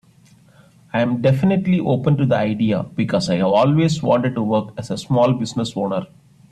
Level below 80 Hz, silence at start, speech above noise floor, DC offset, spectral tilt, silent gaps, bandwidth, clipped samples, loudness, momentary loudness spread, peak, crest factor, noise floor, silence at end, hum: -52 dBFS; 0.95 s; 33 dB; under 0.1%; -7 dB/octave; none; 10.5 kHz; under 0.1%; -19 LUFS; 7 LU; -4 dBFS; 14 dB; -51 dBFS; 0.45 s; none